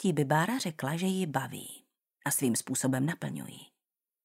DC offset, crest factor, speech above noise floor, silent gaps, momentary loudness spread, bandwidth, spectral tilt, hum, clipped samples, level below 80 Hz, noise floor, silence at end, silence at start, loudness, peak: under 0.1%; 20 dB; 59 dB; none; 17 LU; 16 kHz; -4.5 dB/octave; none; under 0.1%; -76 dBFS; -90 dBFS; 0.6 s; 0 s; -31 LUFS; -12 dBFS